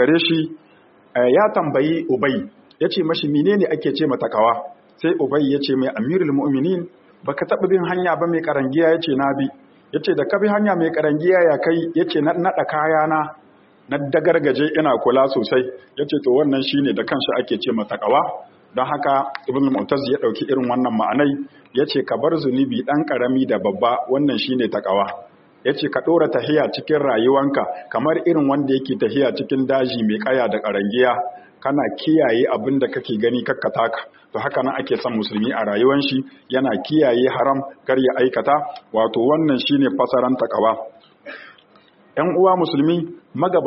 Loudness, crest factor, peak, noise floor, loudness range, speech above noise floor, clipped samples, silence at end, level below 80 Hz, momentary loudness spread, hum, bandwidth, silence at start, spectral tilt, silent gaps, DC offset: -19 LUFS; 16 dB; -2 dBFS; -52 dBFS; 2 LU; 34 dB; under 0.1%; 0 s; -64 dBFS; 8 LU; none; 5.8 kHz; 0 s; -4 dB/octave; none; under 0.1%